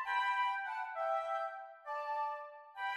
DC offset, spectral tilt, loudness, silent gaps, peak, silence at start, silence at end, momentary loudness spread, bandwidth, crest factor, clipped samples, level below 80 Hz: under 0.1%; 1.5 dB/octave; -38 LUFS; none; -24 dBFS; 0 s; 0 s; 11 LU; 13 kHz; 14 dB; under 0.1%; -84 dBFS